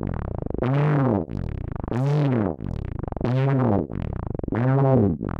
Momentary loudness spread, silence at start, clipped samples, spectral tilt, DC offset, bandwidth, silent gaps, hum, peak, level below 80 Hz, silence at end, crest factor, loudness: 11 LU; 0 s; under 0.1%; -10 dB/octave; under 0.1%; 5.6 kHz; none; none; -6 dBFS; -38 dBFS; 0 s; 18 dB; -24 LUFS